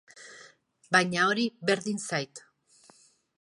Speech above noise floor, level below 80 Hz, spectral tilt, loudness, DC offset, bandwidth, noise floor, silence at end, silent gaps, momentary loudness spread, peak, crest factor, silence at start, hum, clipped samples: 33 dB; -76 dBFS; -3.5 dB/octave; -27 LUFS; under 0.1%; 11.5 kHz; -61 dBFS; 1 s; none; 23 LU; -8 dBFS; 24 dB; 0.15 s; none; under 0.1%